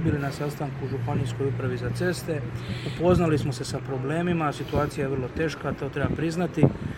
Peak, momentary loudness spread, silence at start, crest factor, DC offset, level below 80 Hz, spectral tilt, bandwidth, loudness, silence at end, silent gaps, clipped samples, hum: -4 dBFS; 8 LU; 0 s; 24 dB; under 0.1%; -44 dBFS; -7 dB/octave; 16.5 kHz; -27 LUFS; 0 s; none; under 0.1%; none